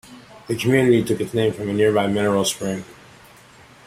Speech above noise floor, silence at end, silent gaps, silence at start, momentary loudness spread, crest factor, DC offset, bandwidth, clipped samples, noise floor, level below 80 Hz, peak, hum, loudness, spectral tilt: 28 dB; 0.95 s; none; 0.1 s; 11 LU; 18 dB; under 0.1%; 16 kHz; under 0.1%; -47 dBFS; -56 dBFS; -4 dBFS; none; -20 LUFS; -5 dB/octave